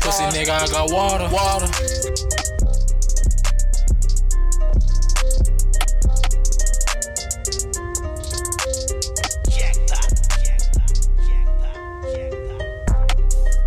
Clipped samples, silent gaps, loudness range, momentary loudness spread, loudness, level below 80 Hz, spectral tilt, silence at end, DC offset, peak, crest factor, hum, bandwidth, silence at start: under 0.1%; none; 3 LU; 7 LU; -21 LUFS; -16 dBFS; -3.5 dB/octave; 0 s; under 0.1%; -6 dBFS; 10 dB; none; 14.5 kHz; 0 s